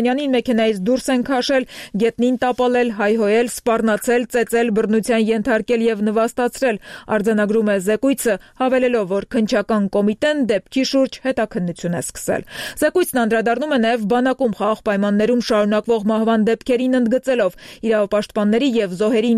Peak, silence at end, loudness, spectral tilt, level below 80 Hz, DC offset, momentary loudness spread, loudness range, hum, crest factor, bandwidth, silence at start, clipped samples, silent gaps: -4 dBFS; 0 s; -18 LUFS; -5 dB/octave; -50 dBFS; under 0.1%; 4 LU; 2 LU; none; 14 dB; 15 kHz; 0 s; under 0.1%; none